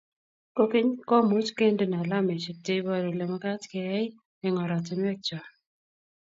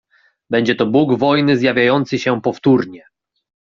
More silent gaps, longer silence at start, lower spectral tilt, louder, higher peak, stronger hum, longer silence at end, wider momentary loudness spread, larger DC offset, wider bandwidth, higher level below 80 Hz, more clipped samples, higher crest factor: first, 4.25-4.41 s vs none; about the same, 0.55 s vs 0.5 s; about the same, -6.5 dB/octave vs -6.5 dB/octave; second, -28 LUFS vs -15 LUFS; second, -10 dBFS vs -2 dBFS; neither; about the same, 0.8 s vs 0.7 s; first, 10 LU vs 5 LU; neither; about the same, 7.8 kHz vs 7.2 kHz; second, -74 dBFS vs -56 dBFS; neither; about the same, 18 dB vs 14 dB